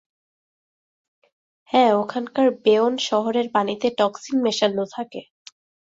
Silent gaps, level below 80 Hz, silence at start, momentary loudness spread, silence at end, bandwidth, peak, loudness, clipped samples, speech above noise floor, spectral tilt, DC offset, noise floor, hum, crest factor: none; -68 dBFS; 1.75 s; 10 LU; 0.65 s; 7.8 kHz; -4 dBFS; -21 LUFS; under 0.1%; over 70 dB; -4.5 dB/octave; under 0.1%; under -90 dBFS; none; 18 dB